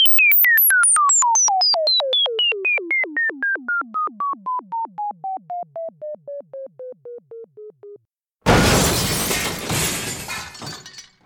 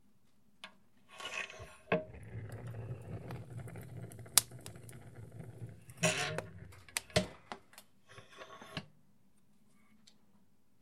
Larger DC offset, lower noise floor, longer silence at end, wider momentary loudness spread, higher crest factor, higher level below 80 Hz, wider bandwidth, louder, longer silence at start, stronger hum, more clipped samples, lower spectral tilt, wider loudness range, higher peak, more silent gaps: neither; second, -64 dBFS vs -73 dBFS; second, 0.25 s vs 1.9 s; about the same, 22 LU vs 22 LU; second, 18 dB vs 42 dB; first, -40 dBFS vs -66 dBFS; first, 19 kHz vs 16.5 kHz; first, -16 LUFS vs -38 LUFS; second, 0 s vs 0.65 s; neither; neither; about the same, -1.5 dB/octave vs -2.5 dB/octave; first, 16 LU vs 7 LU; about the same, -2 dBFS vs 0 dBFS; neither